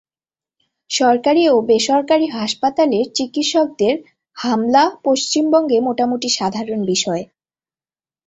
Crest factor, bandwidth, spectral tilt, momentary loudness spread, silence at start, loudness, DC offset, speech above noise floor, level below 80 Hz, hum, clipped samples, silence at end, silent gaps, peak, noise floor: 16 dB; 8.4 kHz; -3.5 dB/octave; 7 LU; 0.9 s; -17 LUFS; under 0.1%; over 74 dB; -62 dBFS; none; under 0.1%; 1.05 s; none; -2 dBFS; under -90 dBFS